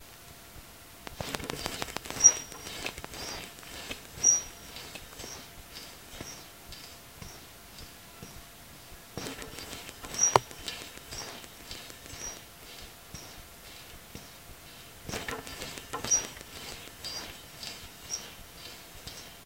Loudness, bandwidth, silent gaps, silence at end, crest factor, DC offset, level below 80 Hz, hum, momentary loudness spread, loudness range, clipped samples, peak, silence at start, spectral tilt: -31 LUFS; 17 kHz; none; 0 s; 36 dB; under 0.1%; -56 dBFS; none; 22 LU; 17 LU; under 0.1%; 0 dBFS; 0 s; -0.5 dB/octave